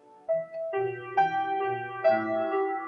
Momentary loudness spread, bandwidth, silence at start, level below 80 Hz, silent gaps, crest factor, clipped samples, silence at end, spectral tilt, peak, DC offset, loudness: 6 LU; 6 kHz; 0.1 s; -76 dBFS; none; 16 dB; under 0.1%; 0 s; -7 dB/octave; -12 dBFS; under 0.1%; -28 LUFS